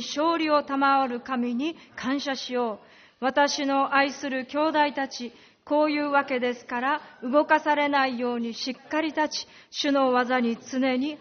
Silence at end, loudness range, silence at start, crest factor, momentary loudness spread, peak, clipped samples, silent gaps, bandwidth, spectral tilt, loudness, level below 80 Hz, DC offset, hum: 0.05 s; 2 LU; 0 s; 18 dB; 9 LU; -8 dBFS; under 0.1%; none; 6.6 kHz; -1 dB/octave; -25 LUFS; -72 dBFS; under 0.1%; none